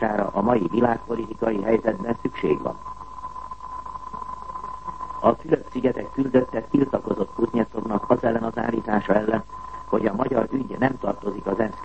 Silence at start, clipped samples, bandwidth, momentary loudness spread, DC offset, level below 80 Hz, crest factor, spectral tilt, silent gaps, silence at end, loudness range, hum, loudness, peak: 0 s; under 0.1%; 8.6 kHz; 13 LU; 0.7%; -48 dBFS; 20 dB; -8.5 dB/octave; none; 0 s; 5 LU; none; -24 LUFS; -4 dBFS